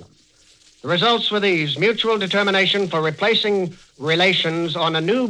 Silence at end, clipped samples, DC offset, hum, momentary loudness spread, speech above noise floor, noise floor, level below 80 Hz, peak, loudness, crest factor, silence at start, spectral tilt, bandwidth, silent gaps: 0 s; under 0.1%; under 0.1%; none; 6 LU; 35 dB; -54 dBFS; -62 dBFS; -4 dBFS; -18 LUFS; 16 dB; 0 s; -5 dB/octave; 11 kHz; none